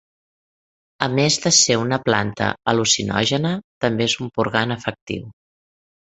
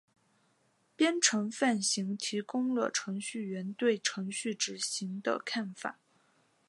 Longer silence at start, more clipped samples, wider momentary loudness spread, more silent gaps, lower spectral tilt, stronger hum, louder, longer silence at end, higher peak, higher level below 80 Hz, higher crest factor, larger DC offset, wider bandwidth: about the same, 1 s vs 1 s; neither; about the same, 12 LU vs 10 LU; first, 3.64-3.81 s, 5.01-5.07 s vs none; about the same, -3 dB/octave vs -3 dB/octave; neither; first, -19 LUFS vs -32 LUFS; about the same, 0.85 s vs 0.75 s; first, 0 dBFS vs -12 dBFS; first, -52 dBFS vs -88 dBFS; about the same, 22 dB vs 22 dB; neither; second, 8.2 kHz vs 11.5 kHz